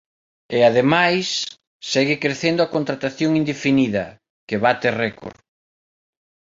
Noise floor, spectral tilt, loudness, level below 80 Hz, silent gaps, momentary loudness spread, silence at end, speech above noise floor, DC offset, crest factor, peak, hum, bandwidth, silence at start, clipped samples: under -90 dBFS; -5 dB/octave; -19 LUFS; -58 dBFS; 1.67-1.80 s, 4.30-4.47 s; 12 LU; 1.25 s; over 71 dB; under 0.1%; 20 dB; -2 dBFS; none; 7.8 kHz; 0.5 s; under 0.1%